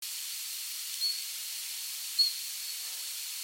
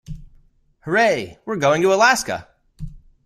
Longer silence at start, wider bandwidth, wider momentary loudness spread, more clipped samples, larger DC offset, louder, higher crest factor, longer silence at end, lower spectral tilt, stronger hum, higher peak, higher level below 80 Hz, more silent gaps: about the same, 0 s vs 0.1 s; about the same, 17.5 kHz vs 16 kHz; second, 8 LU vs 24 LU; neither; neither; second, -32 LUFS vs -18 LUFS; about the same, 20 dB vs 20 dB; second, 0 s vs 0.25 s; second, 8 dB/octave vs -3.5 dB/octave; neither; second, -16 dBFS vs -2 dBFS; second, under -90 dBFS vs -44 dBFS; neither